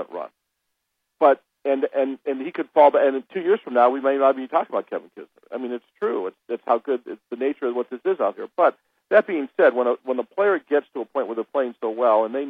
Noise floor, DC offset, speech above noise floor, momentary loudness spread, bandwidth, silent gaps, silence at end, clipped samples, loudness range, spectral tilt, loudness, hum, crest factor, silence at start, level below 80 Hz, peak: -77 dBFS; under 0.1%; 56 dB; 12 LU; 4.7 kHz; none; 0 s; under 0.1%; 6 LU; -7.5 dB/octave; -22 LUFS; none; 20 dB; 0 s; -84 dBFS; -2 dBFS